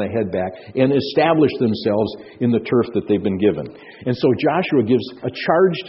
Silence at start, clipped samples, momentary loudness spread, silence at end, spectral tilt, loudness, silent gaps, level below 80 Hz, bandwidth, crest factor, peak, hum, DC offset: 0 s; under 0.1%; 9 LU; 0 s; -5.5 dB/octave; -19 LUFS; none; -56 dBFS; 5.8 kHz; 18 dB; 0 dBFS; none; under 0.1%